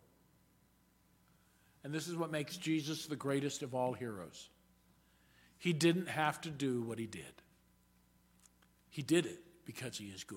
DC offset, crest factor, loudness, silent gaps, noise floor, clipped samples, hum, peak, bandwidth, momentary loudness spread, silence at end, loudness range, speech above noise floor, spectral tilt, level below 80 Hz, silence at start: under 0.1%; 24 dB; -38 LUFS; none; -71 dBFS; under 0.1%; none; -18 dBFS; 17 kHz; 18 LU; 0 s; 4 LU; 33 dB; -5 dB/octave; -76 dBFS; 1.85 s